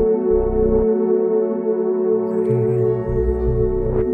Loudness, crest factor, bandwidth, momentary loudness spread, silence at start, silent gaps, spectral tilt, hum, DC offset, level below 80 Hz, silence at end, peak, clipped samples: -19 LUFS; 12 dB; 2.8 kHz; 3 LU; 0 s; none; -12.5 dB/octave; none; under 0.1%; -28 dBFS; 0 s; -6 dBFS; under 0.1%